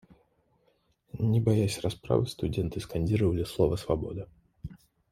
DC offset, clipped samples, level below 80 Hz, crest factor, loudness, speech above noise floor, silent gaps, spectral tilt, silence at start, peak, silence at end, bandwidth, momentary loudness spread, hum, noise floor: under 0.1%; under 0.1%; -48 dBFS; 20 dB; -29 LUFS; 42 dB; none; -7 dB/octave; 1.15 s; -10 dBFS; 0.35 s; 16 kHz; 20 LU; none; -70 dBFS